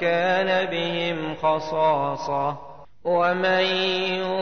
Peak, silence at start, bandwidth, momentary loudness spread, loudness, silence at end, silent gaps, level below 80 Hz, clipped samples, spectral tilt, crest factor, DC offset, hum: -10 dBFS; 0 s; 6.6 kHz; 6 LU; -23 LUFS; 0 s; none; -60 dBFS; under 0.1%; -5 dB/octave; 12 dB; 0.5%; none